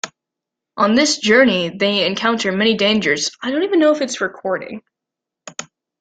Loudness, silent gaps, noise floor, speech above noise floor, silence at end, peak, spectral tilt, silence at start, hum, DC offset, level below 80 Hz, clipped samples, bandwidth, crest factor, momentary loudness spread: -16 LUFS; none; -84 dBFS; 67 dB; 0.35 s; 0 dBFS; -3.5 dB/octave; 0.05 s; none; under 0.1%; -60 dBFS; under 0.1%; 9.4 kHz; 18 dB; 19 LU